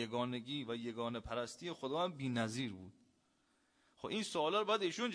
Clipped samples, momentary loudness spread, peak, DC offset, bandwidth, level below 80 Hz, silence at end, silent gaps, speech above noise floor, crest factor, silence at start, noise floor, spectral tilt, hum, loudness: under 0.1%; 9 LU; -22 dBFS; under 0.1%; 10.5 kHz; -68 dBFS; 0 s; none; 37 dB; 18 dB; 0 s; -77 dBFS; -4.5 dB/octave; none; -40 LUFS